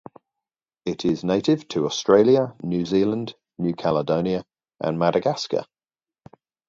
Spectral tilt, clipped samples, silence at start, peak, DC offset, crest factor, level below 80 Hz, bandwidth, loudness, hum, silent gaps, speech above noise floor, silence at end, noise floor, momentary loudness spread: -6 dB/octave; under 0.1%; 0.85 s; -4 dBFS; under 0.1%; 20 dB; -58 dBFS; 7.6 kHz; -22 LUFS; none; none; over 69 dB; 1.05 s; under -90 dBFS; 12 LU